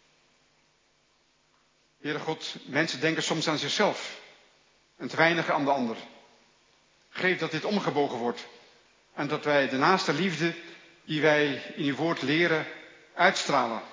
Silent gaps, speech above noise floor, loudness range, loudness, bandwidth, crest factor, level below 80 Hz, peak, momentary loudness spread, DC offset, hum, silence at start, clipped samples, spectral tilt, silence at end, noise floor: none; 40 dB; 5 LU; -27 LUFS; 7.6 kHz; 24 dB; -82 dBFS; -6 dBFS; 17 LU; under 0.1%; none; 2.05 s; under 0.1%; -4.5 dB/octave; 0 s; -67 dBFS